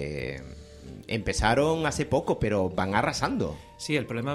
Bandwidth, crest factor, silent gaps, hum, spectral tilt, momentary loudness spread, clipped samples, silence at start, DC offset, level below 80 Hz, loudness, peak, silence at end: 15 kHz; 20 dB; none; none; -5 dB/octave; 17 LU; under 0.1%; 0 s; under 0.1%; -42 dBFS; -27 LUFS; -8 dBFS; 0 s